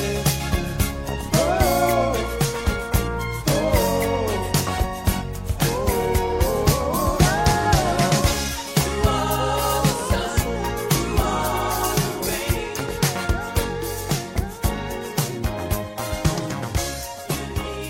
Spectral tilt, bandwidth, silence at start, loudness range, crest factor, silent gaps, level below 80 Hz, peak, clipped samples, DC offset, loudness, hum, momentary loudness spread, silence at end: -4.5 dB/octave; 16.5 kHz; 0 s; 5 LU; 18 dB; none; -30 dBFS; -2 dBFS; under 0.1%; under 0.1%; -22 LUFS; none; 8 LU; 0 s